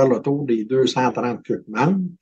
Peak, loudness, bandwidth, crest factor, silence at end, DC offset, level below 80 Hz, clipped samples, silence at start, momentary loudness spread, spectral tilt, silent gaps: -6 dBFS; -21 LUFS; 8.4 kHz; 14 dB; 0.1 s; under 0.1%; -66 dBFS; under 0.1%; 0 s; 7 LU; -6.5 dB/octave; none